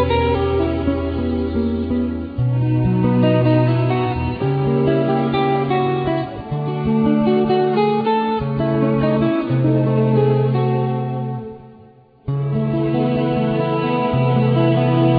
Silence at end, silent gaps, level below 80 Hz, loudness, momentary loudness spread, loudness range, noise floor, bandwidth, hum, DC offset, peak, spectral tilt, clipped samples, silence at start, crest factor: 0 s; none; -38 dBFS; -18 LUFS; 6 LU; 3 LU; -46 dBFS; 4.9 kHz; none; under 0.1%; -4 dBFS; -11.5 dB/octave; under 0.1%; 0 s; 14 dB